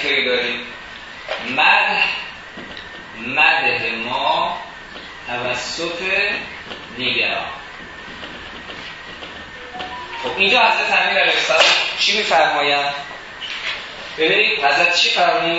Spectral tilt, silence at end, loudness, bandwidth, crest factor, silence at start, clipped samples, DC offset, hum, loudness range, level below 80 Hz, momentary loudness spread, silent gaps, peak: -2 dB/octave; 0 s; -16 LUFS; 8 kHz; 18 dB; 0 s; under 0.1%; under 0.1%; none; 9 LU; -52 dBFS; 19 LU; none; 0 dBFS